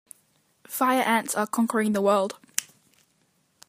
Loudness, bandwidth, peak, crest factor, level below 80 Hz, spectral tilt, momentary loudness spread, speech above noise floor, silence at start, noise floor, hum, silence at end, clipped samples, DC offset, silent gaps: -25 LUFS; 15.5 kHz; -2 dBFS; 24 dB; -78 dBFS; -3.5 dB/octave; 9 LU; 44 dB; 0.7 s; -68 dBFS; none; 1.05 s; under 0.1%; under 0.1%; none